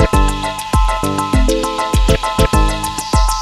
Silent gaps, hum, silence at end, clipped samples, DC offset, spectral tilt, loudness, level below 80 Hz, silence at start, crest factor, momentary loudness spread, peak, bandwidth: none; none; 0 s; under 0.1%; under 0.1%; -5 dB/octave; -16 LUFS; -16 dBFS; 0 s; 14 dB; 4 LU; 0 dBFS; 14 kHz